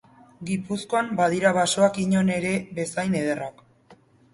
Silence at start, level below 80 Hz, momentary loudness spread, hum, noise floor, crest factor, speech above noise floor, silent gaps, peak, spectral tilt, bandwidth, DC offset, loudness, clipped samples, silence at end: 0.4 s; -60 dBFS; 10 LU; none; -55 dBFS; 18 dB; 32 dB; none; -6 dBFS; -5 dB/octave; 11.5 kHz; under 0.1%; -24 LUFS; under 0.1%; 0.4 s